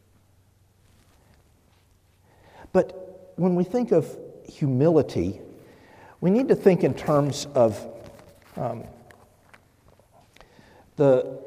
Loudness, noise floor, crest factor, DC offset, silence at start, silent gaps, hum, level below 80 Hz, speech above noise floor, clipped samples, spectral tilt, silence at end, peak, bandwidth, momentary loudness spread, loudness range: -23 LUFS; -60 dBFS; 20 dB; under 0.1%; 2.75 s; none; none; -60 dBFS; 38 dB; under 0.1%; -7.5 dB/octave; 0 s; -4 dBFS; 15.5 kHz; 22 LU; 9 LU